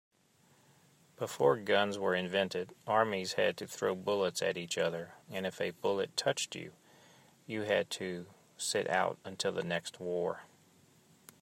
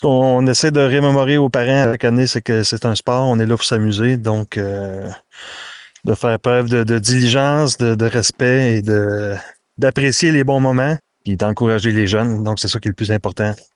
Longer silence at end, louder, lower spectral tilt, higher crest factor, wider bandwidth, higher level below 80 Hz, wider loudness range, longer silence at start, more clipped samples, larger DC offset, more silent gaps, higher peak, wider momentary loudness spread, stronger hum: first, 0.95 s vs 0.2 s; second, -34 LUFS vs -16 LUFS; second, -3.5 dB/octave vs -5 dB/octave; first, 22 dB vs 12 dB; first, 16 kHz vs 11.5 kHz; second, -82 dBFS vs -50 dBFS; about the same, 4 LU vs 4 LU; first, 1.2 s vs 0 s; neither; neither; neither; second, -14 dBFS vs -2 dBFS; about the same, 11 LU vs 11 LU; neither